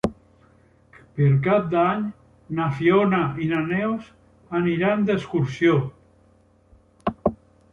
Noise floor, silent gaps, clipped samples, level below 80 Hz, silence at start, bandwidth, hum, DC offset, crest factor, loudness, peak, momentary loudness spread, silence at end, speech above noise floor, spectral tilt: -58 dBFS; none; under 0.1%; -52 dBFS; 0.05 s; 7.4 kHz; none; under 0.1%; 18 dB; -22 LUFS; -4 dBFS; 12 LU; 0.35 s; 37 dB; -8.5 dB/octave